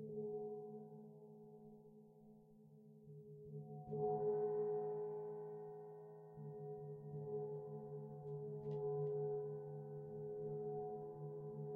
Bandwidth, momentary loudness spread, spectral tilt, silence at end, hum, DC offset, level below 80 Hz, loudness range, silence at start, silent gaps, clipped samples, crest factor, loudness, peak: 2 kHz; 20 LU; -11.5 dB/octave; 0 s; none; under 0.1%; -82 dBFS; 9 LU; 0 s; none; under 0.1%; 16 dB; -47 LUFS; -32 dBFS